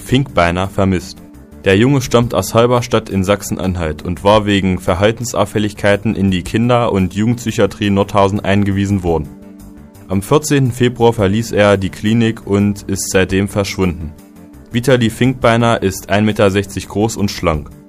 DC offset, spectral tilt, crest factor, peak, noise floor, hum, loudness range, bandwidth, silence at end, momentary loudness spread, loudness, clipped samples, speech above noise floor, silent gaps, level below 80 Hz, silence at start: under 0.1%; -5.5 dB/octave; 14 dB; 0 dBFS; -36 dBFS; none; 2 LU; 16 kHz; 0.15 s; 7 LU; -14 LUFS; under 0.1%; 22 dB; none; -36 dBFS; 0 s